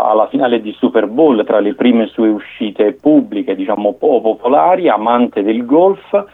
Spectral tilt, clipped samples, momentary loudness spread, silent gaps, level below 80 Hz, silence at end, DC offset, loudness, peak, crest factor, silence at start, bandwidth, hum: -8.5 dB/octave; under 0.1%; 6 LU; none; -60 dBFS; 0.05 s; under 0.1%; -13 LUFS; 0 dBFS; 12 dB; 0 s; 4 kHz; none